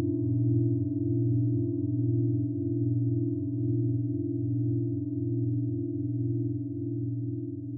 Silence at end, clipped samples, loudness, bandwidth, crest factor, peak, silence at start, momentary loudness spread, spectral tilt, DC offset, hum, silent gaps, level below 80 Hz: 0 s; under 0.1%; -29 LUFS; 0.7 kHz; 12 dB; -16 dBFS; 0 s; 6 LU; -17 dB/octave; under 0.1%; none; none; -72 dBFS